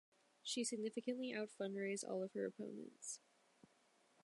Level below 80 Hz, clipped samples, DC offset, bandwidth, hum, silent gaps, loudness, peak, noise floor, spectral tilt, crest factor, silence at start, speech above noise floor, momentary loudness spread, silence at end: under -90 dBFS; under 0.1%; under 0.1%; 11.5 kHz; none; none; -46 LUFS; -30 dBFS; -76 dBFS; -3.5 dB/octave; 16 dB; 0.45 s; 30 dB; 9 LU; 1.05 s